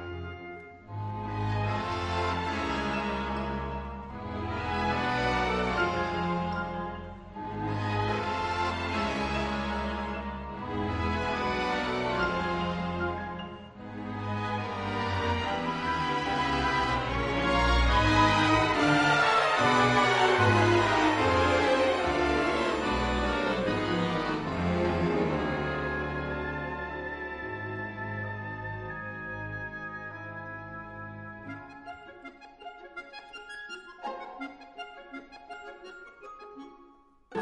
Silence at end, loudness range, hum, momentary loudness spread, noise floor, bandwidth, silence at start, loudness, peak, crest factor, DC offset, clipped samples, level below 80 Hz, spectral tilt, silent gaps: 0 s; 19 LU; none; 20 LU; -58 dBFS; 11 kHz; 0 s; -28 LUFS; -12 dBFS; 18 dB; under 0.1%; under 0.1%; -42 dBFS; -5.5 dB/octave; none